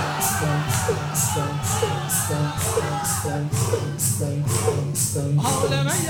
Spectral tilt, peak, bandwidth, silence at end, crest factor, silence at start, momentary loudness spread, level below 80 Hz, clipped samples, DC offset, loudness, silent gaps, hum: -4 dB/octave; -8 dBFS; 18.5 kHz; 0 s; 14 dB; 0 s; 3 LU; -46 dBFS; under 0.1%; under 0.1%; -22 LUFS; none; none